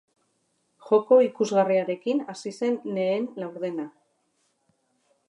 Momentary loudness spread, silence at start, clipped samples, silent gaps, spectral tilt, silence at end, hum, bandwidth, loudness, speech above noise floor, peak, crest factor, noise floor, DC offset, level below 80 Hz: 14 LU; 0.85 s; under 0.1%; none; -6 dB/octave; 1.4 s; none; 10.5 kHz; -25 LUFS; 48 dB; -8 dBFS; 18 dB; -72 dBFS; under 0.1%; -84 dBFS